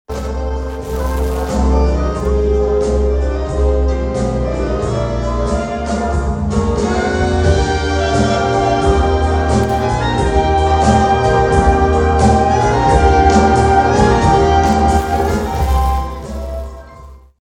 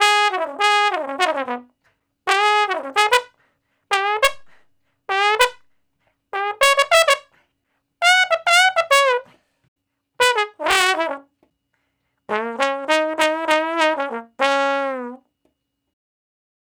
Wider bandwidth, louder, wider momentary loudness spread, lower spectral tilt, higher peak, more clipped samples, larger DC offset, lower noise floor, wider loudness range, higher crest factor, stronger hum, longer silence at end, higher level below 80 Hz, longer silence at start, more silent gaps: second, 13.5 kHz vs over 20 kHz; first, -14 LUFS vs -18 LUFS; second, 8 LU vs 12 LU; first, -6.5 dB/octave vs 0 dB/octave; about the same, 0 dBFS vs 0 dBFS; neither; neither; second, -37 dBFS vs -72 dBFS; about the same, 6 LU vs 5 LU; second, 14 dB vs 20 dB; neither; second, 0.3 s vs 1.6 s; first, -20 dBFS vs -60 dBFS; about the same, 0.1 s vs 0 s; second, none vs 9.68-9.76 s